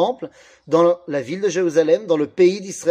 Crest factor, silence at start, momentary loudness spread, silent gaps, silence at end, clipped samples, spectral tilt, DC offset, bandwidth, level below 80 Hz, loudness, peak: 16 dB; 0 s; 8 LU; none; 0 s; under 0.1%; -5.5 dB/octave; under 0.1%; 10.5 kHz; -68 dBFS; -19 LUFS; -4 dBFS